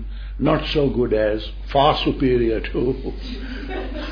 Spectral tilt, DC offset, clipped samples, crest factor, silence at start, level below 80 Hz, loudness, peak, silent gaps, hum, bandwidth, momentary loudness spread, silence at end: -8 dB/octave; under 0.1%; under 0.1%; 18 dB; 0 s; -30 dBFS; -21 LUFS; -4 dBFS; none; none; 5.4 kHz; 13 LU; 0 s